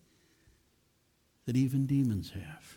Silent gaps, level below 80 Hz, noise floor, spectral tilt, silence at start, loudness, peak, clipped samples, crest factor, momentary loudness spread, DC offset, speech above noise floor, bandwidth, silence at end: none; -62 dBFS; -72 dBFS; -7.5 dB/octave; 1.45 s; -31 LUFS; -20 dBFS; under 0.1%; 14 dB; 15 LU; under 0.1%; 41 dB; 17 kHz; 0.05 s